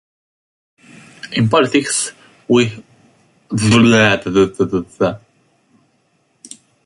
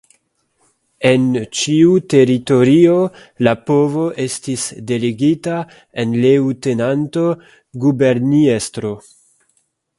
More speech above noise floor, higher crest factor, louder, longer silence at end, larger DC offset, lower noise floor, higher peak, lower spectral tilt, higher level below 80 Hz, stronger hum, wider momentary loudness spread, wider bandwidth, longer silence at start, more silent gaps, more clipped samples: about the same, 47 dB vs 49 dB; about the same, 18 dB vs 16 dB; about the same, -15 LUFS vs -15 LUFS; first, 1.7 s vs 1 s; neither; about the same, -61 dBFS vs -64 dBFS; about the same, 0 dBFS vs 0 dBFS; second, -4.5 dB/octave vs -6 dB/octave; first, -48 dBFS vs -56 dBFS; neither; first, 24 LU vs 11 LU; about the same, 11.5 kHz vs 11.5 kHz; first, 1.25 s vs 1 s; neither; neither